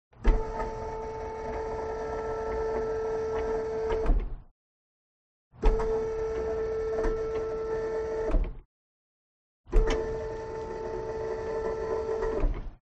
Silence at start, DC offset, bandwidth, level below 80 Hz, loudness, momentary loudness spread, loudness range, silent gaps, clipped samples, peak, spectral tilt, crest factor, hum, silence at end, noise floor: 0.15 s; under 0.1%; 8 kHz; -34 dBFS; -32 LUFS; 7 LU; 2 LU; 4.51-5.51 s, 8.65-9.64 s; under 0.1%; -10 dBFS; -7 dB/octave; 20 dB; none; 0.1 s; under -90 dBFS